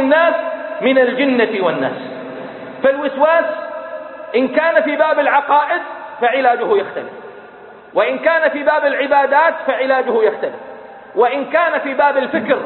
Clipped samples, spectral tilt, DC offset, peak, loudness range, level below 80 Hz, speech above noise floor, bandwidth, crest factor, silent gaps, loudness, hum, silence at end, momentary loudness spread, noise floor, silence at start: under 0.1%; -9.5 dB/octave; under 0.1%; 0 dBFS; 2 LU; -64 dBFS; 23 dB; 4.3 kHz; 16 dB; none; -15 LUFS; none; 0 s; 15 LU; -38 dBFS; 0 s